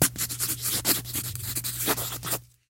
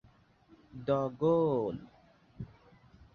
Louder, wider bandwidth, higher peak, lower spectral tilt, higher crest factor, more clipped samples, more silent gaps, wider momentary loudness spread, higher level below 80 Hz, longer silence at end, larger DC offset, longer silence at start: first, -27 LUFS vs -31 LUFS; first, 17 kHz vs 6.6 kHz; first, -6 dBFS vs -16 dBFS; second, -2 dB/octave vs -9.5 dB/octave; first, 24 dB vs 18 dB; neither; neither; second, 6 LU vs 21 LU; first, -52 dBFS vs -64 dBFS; second, 0.25 s vs 0.7 s; neither; second, 0 s vs 0.75 s